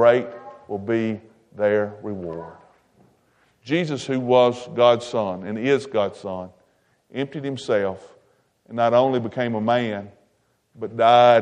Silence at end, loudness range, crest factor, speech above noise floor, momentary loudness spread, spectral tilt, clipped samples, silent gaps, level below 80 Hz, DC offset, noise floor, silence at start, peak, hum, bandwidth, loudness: 0 s; 6 LU; 20 dB; 46 dB; 17 LU; -6 dB/octave; under 0.1%; none; -68 dBFS; under 0.1%; -66 dBFS; 0 s; -2 dBFS; none; 9.8 kHz; -22 LUFS